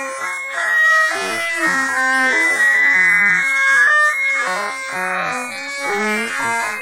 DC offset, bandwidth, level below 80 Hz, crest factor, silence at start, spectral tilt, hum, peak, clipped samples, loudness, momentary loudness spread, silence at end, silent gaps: under 0.1%; 16 kHz; -66 dBFS; 12 dB; 0 s; -1.5 dB/octave; none; -4 dBFS; under 0.1%; -15 LUFS; 11 LU; 0 s; none